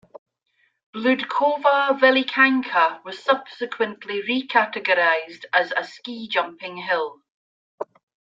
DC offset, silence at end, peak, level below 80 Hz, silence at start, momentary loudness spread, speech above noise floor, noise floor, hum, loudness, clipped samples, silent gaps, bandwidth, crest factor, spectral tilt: under 0.1%; 0.5 s; -2 dBFS; -76 dBFS; 0.15 s; 16 LU; 46 dB; -68 dBFS; none; -21 LUFS; under 0.1%; 0.18-0.26 s, 0.86-0.93 s, 7.30-7.78 s; 7.6 kHz; 22 dB; -4.5 dB/octave